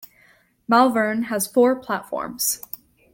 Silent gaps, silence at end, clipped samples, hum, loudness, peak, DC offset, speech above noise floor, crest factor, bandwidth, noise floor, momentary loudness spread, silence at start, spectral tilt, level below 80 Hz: none; 0.55 s; under 0.1%; none; -21 LUFS; -4 dBFS; under 0.1%; 37 dB; 18 dB; 17 kHz; -57 dBFS; 17 LU; 0.7 s; -3 dB/octave; -64 dBFS